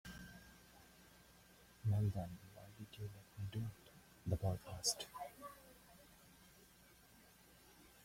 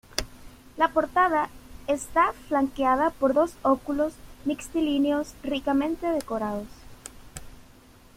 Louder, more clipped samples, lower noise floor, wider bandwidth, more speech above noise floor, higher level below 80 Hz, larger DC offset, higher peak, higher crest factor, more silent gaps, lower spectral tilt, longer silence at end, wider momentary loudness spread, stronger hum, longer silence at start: second, -45 LUFS vs -26 LUFS; neither; first, -67 dBFS vs -52 dBFS; about the same, 16.5 kHz vs 16.5 kHz; second, 22 dB vs 27 dB; second, -66 dBFS vs -48 dBFS; neither; second, -24 dBFS vs -6 dBFS; about the same, 22 dB vs 22 dB; neither; about the same, -4.5 dB/octave vs -4.5 dB/octave; second, 0 s vs 0.55 s; first, 25 LU vs 21 LU; neither; about the same, 0.05 s vs 0.15 s